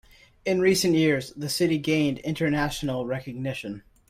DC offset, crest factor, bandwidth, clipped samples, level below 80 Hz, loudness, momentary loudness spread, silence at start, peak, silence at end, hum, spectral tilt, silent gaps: under 0.1%; 16 dB; 16 kHz; under 0.1%; -52 dBFS; -25 LUFS; 11 LU; 0.45 s; -10 dBFS; 0.3 s; none; -5 dB/octave; none